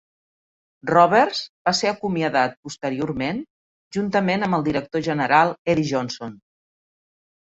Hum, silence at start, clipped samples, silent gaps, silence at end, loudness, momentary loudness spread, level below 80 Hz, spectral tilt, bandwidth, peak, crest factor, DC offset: none; 0.85 s; under 0.1%; 1.49-1.65 s, 2.57-2.63 s, 3.50-3.91 s, 5.59-5.65 s; 1.2 s; -21 LUFS; 13 LU; -56 dBFS; -5 dB/octave; 8.2 kHz; -2 dBFS; 20 dB; under 0.1%